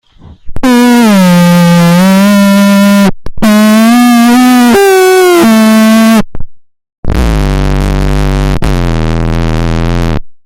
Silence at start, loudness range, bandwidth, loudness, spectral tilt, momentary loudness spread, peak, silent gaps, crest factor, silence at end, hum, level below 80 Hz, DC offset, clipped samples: 0.45 s; 7 LU; 17 kHz; -6 LUFS; -6 dB/octave; 7 LU; 0 dBFS; 6.98-7.03 s; 6 dB; 0.1 s; none; -16 dBFS; under 0.1%; 0.2%